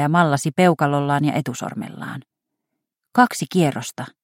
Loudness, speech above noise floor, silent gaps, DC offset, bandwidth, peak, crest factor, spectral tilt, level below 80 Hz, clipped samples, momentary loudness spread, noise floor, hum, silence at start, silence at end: -19 LUFS; 60 dB; none; under 0.1%; 16.5 kHz; -2 dBFS; 20 dB; -6 dB/octave; -64 dBFS; under 0.1%; 14 LU; -80 dBFS; none; 0 s; 0.15 s